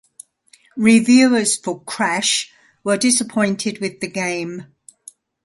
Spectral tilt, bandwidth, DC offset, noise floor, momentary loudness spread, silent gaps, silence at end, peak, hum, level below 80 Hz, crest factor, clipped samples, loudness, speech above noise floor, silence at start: -3 dB/octave; 11.5 kHz; under 0.1%; -54 dBFS; 16 LU; none; 0.8 s; 0 dBFS; none; -64 dBFS; 18 dB; under 0.1%; -17 LUFS; 37 dB; 0.75 s